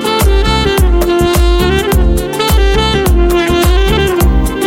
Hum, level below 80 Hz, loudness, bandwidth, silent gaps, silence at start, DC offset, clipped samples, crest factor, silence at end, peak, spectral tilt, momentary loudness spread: none; -12 dBFS; -11 LUFS; 17 kHz; none; 0 s; under 0.1%; under 0.1%; 8 dB; 0 s; 0 dBFS; -5.5 dB/octave; 1 LU